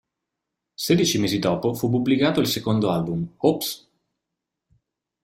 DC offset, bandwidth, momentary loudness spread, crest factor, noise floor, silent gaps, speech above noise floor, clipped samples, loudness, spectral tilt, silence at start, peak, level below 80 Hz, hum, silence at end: under 0.1%; 16 kHz; 8 LU; 20 dB; -83 dBFS; none; 62 dB; under 0.1%; -22 LUFS; -5 dB/octave; 0.8 s; -4 dBFS; -56 dBFS; none; 1.45 s